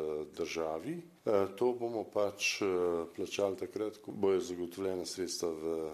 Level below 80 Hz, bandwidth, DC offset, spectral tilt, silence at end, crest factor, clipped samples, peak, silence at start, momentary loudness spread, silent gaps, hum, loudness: -70 dBFS; 14 kHz; under 0.1%; -4 dB/octave; 0 s; 18 dB; under 0.1%; -16 dBFS; 0 s; 7 LU; none; none; -35 LUFS